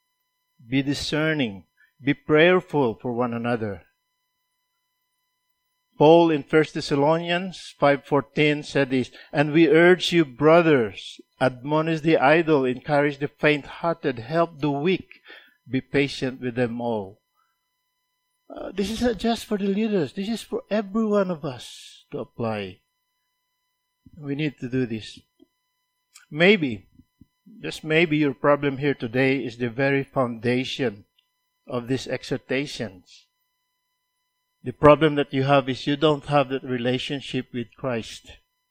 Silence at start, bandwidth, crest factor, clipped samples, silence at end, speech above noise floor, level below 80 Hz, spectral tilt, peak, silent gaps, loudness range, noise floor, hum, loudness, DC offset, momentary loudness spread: 0.7 s; 15 kHz; 24 dB; under 0.1%; 0.35 s; 54 dB; -56 dBFS; -6 dB/octave; 0 dBFS; none; 11 LU; -76 dBFS; none; -22 LUFS; under 0.1%; 16 LU